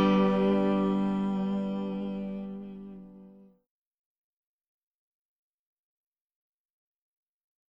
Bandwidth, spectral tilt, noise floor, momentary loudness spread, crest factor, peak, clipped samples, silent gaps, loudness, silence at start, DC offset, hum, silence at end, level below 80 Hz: 5.8 kHz; -9 dB/octave; -53 dBFS; 19 LU; 18 dB; -14 dBFS; under 0.1%; none; -28 LUFS; 0 s; under 0.1%; none; 4.35 s; -58 dBFS